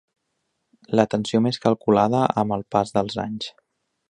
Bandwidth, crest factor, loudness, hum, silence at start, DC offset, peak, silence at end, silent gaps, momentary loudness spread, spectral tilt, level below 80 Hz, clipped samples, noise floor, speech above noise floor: 10 kHz; 22 dB; -22 LUFS; none; 0.9 s; under 0.1%; 0 dBFS; 0.6 s; none; 10 LU; -6.5 dB/octave; -56 dBFS; under 0.1%; -75 dBFS; 54 dB